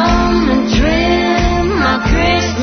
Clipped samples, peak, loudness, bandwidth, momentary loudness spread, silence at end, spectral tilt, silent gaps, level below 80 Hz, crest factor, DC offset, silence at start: under 0.1%; -2 dBFS; -13 LUFS; 6.6 kHz; 1 LU; 0 s; -5.5 dB/octave; none; -20 dBFS; 10 dB; under 0.1%; 0 s